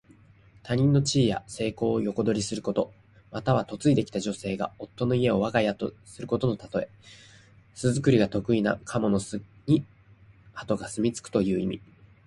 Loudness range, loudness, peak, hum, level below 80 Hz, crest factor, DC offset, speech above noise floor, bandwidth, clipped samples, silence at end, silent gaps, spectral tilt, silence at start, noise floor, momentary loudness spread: 2 LU; -27 LUFS; -8 dBFS; none; -54 dBFS; 20 dB; under 0.1%; 29 dB; 11.5 kHz; under 0.1%; 0.5 s; none; -6 dB/octave; 0.65 s; -55 dBFS; 12 LU